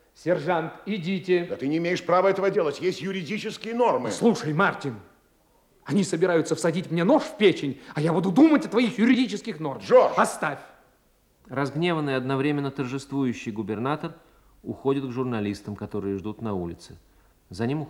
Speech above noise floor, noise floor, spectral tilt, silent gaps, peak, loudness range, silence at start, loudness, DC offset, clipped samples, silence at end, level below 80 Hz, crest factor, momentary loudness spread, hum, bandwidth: 39 dB; -63 dBFS; -6 dB/octave; none; -6 dBFS; 8 LU; 0.2 s; -25 LUFS; under 0.1%; under 0.1%; 0 s; -64 dBFS; 18 dB; 12 LU; none; 14 kHz